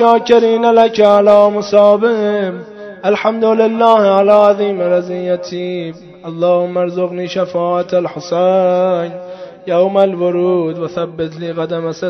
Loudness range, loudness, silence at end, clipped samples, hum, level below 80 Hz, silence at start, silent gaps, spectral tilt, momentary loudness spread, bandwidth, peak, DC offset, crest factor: 6 LU; -13 LUFS; 0 s; 0.3%; none; -58 dBFS; 0 s; none; -6.5 dB/octave; 13 LU; 6.8 kHz; 0 dBFS; under 0.1%; 12 dB